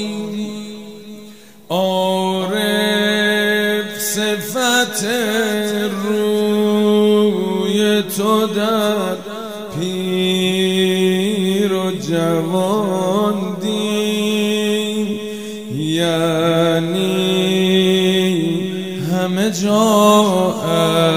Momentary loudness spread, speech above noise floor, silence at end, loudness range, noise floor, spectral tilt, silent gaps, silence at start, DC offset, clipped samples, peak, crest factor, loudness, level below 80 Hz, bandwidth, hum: 10 LU; 25 dB; 0 s; 3 LU; -40 dBFS; -4.5 dB/octave; none; 0 s; 0.5%; under 0.1%; 0 dBFS; 16 dB; -17 LUFS; -60 dBFS; 16 kHz; none